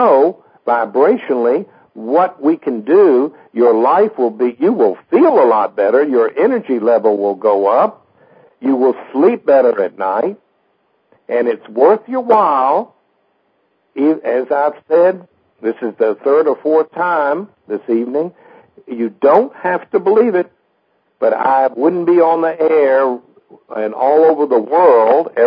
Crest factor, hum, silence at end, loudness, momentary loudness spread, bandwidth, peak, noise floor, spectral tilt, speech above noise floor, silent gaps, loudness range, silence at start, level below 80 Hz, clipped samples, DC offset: 14 dB; none; 0 s; -14 LUFS; 10 LU; 5.2 kHz; 0 dBFS; -62 dBFS; -10 dB/octave; 49 dB; none; 4 LU; 0 s; -74 dBFS; under 0.1%; under 0.1%